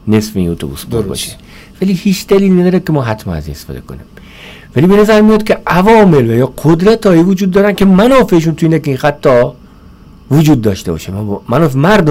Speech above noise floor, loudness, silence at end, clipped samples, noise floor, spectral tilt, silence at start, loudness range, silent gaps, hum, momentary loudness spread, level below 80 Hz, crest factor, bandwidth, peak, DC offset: 27 dB; -10 LUFS; 0 s; under 0.1%; -37 dBFS; -7 dB/octave; 0.05 s; 5 LU; none; none; 13 LU; -34 dBFS; 8 dB; 16 kHz; -2 dBFS; under 0.1%